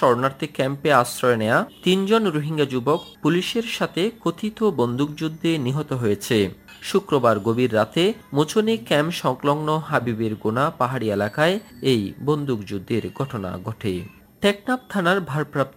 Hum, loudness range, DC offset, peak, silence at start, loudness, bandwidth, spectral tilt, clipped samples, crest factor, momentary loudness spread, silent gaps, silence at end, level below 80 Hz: none; 4 LU; under 0.1%; -2 dBFS; 0 s; -22 LUFS; 16 kHz; -5.5 dB/octave; under 0.1%; 20 dB; 8 LU; none; 0.05 s; -58 dBFS